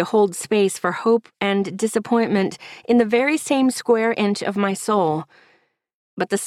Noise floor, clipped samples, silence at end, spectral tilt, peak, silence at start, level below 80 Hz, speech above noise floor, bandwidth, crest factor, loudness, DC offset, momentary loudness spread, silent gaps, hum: -62 dBFS; under 0.1%; 0 s; -5 dB/octave; -4 dBFS; 0 s; -66 dBFS; 42 dB; 14.5 kHz; 16 dB; -20 LUFS; under 0.1%; 5 LU; 5.93-6.17 s; none